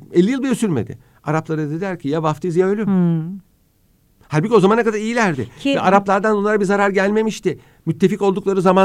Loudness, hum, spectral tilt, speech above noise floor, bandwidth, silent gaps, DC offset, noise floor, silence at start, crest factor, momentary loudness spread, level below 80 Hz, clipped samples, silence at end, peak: -18 LUFS; none; -6.5 dB/octave; 41 dB; 13 kHz; none; under 0.1%; -58 dBFS; 0 s; 18 dB; 9 LU; -56 dBFS; under 0.1%; 0 s; 0 dBFS